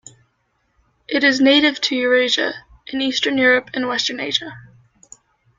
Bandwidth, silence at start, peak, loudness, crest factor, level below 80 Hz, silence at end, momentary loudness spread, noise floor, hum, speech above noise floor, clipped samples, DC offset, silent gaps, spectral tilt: 7.6 kHz; 1.1 s; -2 dBFS; -17 LUFS; 18 dB; -60 dBFS; 0.95 s; 11 LU; -67 dBFS; none; 49 dB; under 0.1%; under 0.1%; none; -2.5 dB/octave